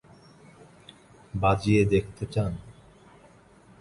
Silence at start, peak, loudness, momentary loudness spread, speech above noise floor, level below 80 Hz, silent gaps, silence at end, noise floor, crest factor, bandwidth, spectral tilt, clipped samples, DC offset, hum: 1.35 s; -10 dBFS; -26 LUFS; 13 LU; 31 dB; -46 dBFS; none; 1.1 s; -55 dBFS; 20 dB; 11.5 kHz; -7.5 dB/octave; under 0.1%; under 0.1%; none